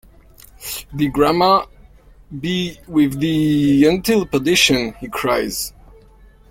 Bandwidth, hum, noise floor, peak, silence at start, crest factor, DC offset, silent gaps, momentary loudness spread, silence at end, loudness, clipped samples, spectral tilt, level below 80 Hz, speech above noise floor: 16.5 kHz; none; -46 dBFS; 0 dBFS; 0.6 s; 18 dB; under 0.1%; none; 15 LU; 0.8 s; -17 LUFS; under 0.1%; -4.5 dB/octave; -42 dBFS; 30 dB